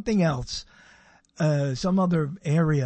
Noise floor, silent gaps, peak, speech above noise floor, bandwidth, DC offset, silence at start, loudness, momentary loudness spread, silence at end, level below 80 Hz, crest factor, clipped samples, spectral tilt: -56 dBFS; none; -10 dBFS; 32 dB; 8.6 kHz; under 0.1%; 0 s; -25 LUFS; 9 LU; 0 s; -48 dBFS; 14 dB; under 0.1%; -7 dB/octave